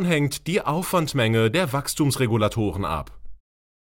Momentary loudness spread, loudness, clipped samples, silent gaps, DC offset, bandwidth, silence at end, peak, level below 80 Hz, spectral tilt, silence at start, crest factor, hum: 7 LU; -23 LUFS; under 0.1%; none; under 0.1%; 17 kHz; 0.5 s; -8 dBFS; -44 dBFS; -5 dB/octave; 0 s; 14 dB; none